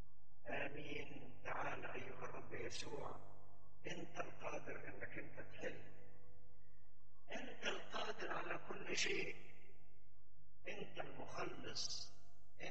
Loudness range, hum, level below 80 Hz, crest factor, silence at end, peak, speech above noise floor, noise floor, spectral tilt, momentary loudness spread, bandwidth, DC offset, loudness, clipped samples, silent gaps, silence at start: 6 LU; 50 Hz at -70 dBFS; -74 dBFS; 24 dB; 0 s; -26 dBFS; 24 dB; -73 dBFS; -3 dB/octave; 13 LU; 8.4 kHz; 0.9%; -48 LUFS; under 0.1%; none; 0 s